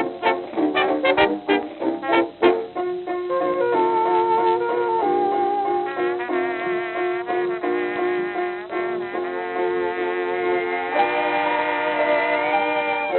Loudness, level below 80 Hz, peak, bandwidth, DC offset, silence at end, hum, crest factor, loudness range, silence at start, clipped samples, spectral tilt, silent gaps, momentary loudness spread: -22 LUFS; -64 dBFS; -4 dBFS; 4.4 kHz; under 0.1%; 0 s; none; 18 dB; 4 LU; 0 s; under 0.1%; -8.5 dB/octave; none; 7 LU